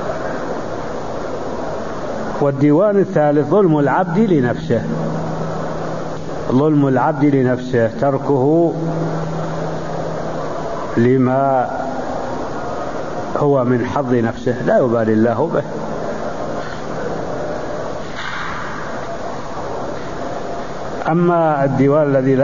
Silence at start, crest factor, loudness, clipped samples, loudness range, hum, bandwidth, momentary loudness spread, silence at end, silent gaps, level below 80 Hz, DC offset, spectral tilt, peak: 0 s; 14 dB; -18 LUFS; under 0.1%; 9 LU; none; 7.4 kHz; 12 LU; 0 s; none; -44 dBFS; 4%; -8 dB/octave; -2 dBFS